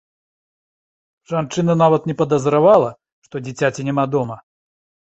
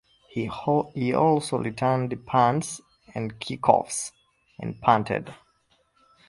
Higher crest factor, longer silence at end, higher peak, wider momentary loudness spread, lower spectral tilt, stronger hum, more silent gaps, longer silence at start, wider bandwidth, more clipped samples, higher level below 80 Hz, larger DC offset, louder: second, 18 dB vs 24 dB; second, 0.65 s vs 0.95 s; about the same, -2 dBFS vs -2 dBFS; about the same, 16 LU vs 15 LU; first, -7 dB/octave vs -5.5 dB/octave; neither; first, 3.12-3.22 s vs none; first, 1.3 s vs 0.35 s; second, 8.2 kHz vs 11.5 kHz; neither; about the same, -58 dBFS vs -58 dBFS; neither; first, -17 LUFS vs -25 LUFS